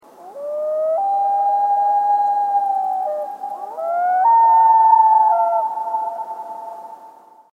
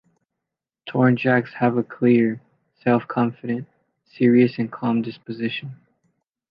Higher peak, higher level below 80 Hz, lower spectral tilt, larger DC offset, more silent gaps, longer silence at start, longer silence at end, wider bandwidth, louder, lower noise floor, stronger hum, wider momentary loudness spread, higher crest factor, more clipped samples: about the same, -2 dBFS vs -4 dBFS; second, under -90 dBFS vs -68 dBFS; second, -4 dB/octave vs -10 dB/octave; neither; neither; second, 0.2 s vs 0.85 s; second, 0.4 s vs 0.75 s; second, 4.3 kHz vs 5.4 kHz; first, -16 LUFS vs -21 LUFS; second, -44 dBFS vs -85 dBFS; neither; first, 17 LU vs 13 LU; about the same, 14 dB vs 18 dB; neither